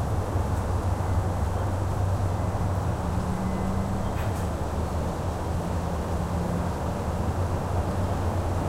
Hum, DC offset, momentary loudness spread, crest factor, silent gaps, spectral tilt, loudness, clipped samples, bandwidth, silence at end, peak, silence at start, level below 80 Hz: none; under 0.1%; 2 LU; 12 dB; none; -7 dB/octave; -28 LUFS; under 0.1%; 15.5 kHz; 0 s; -14 dBFS; 0 s; -34 dBFS